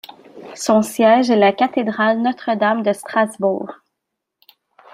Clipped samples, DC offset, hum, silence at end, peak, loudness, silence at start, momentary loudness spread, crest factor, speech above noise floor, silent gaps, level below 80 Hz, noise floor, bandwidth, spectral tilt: under 0.1%; under 0.1%; none; 1.2 s; -2 dBFS; -17 LUFS; 0.35 s; 10 LU; 16 dB; 63 dB; none; -68 dBFS; -79 dBFS; 16 kHz; -5 dB/octave